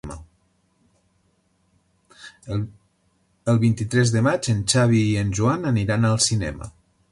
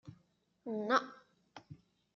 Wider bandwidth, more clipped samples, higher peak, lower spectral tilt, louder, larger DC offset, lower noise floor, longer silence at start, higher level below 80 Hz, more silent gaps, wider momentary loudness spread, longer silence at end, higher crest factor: first, 11.5 kHz vs 7.2 kHz; neither; first, -6 dBFS vs -18 dBFS; first, -5 dB/octave vs -2.5 dB/octave; first, -21 LUFS vs -35 LUFS; neither; second, -65 dBFS vs -74 dBFS; about the same, 0.05 s vs 0.05 s; first, -46 dBFS vs -82 dBFS; neither; second, 18 LU vs 25 LU; about the same, 0.4 s vs 0.4 s; second, 16 dB vs 22 dB